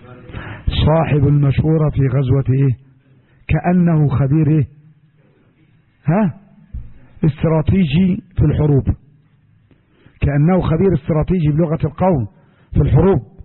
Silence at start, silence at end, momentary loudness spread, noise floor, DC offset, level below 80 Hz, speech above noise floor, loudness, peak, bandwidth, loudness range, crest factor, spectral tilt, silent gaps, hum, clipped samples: 0.1 s; 0 s; 13 LU; -53 dBFS; under 0.1%; -30 dBFS; 39 dB; -16 LUFS; -4 dBFS; 4.3 kHz; 3 LU; 12 dB; -13.5 dB/octave; none; none; under 0.1%